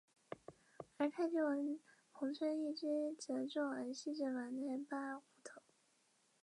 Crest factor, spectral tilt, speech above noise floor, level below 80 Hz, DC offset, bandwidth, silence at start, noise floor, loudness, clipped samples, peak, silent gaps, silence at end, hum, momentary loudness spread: 16 dB; -4 dB/octave; 36 dB; under -90 dBFS; under 0.1%; 11 kHz; 0.3 s; -77 dBFS; -42 LUFS; under 0.1%; -28 dBFS; none; 0.85 s; none; 19 LU